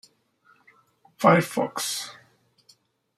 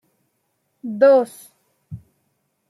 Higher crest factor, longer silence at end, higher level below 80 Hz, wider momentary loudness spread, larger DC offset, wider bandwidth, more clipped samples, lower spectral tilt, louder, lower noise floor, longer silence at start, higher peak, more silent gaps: first, 24 dB vs 18 dB; first, 1.05 s vs 0.75 s; second, -70 dBFS vs -64 dBFS; second, 12 LU vs 26 LU; neither; first, 15.5 kHz vs 13 kHz; neither; second, -4.5 dB/octave vs -6 dB/octave; second, -23 LUFS vs -16 LUFS; second, -62 dBFS vs -71 dBFS; first, 1.2 s vs 0.85 s; about the same, -2 dBFS vs -4 dBFS; neither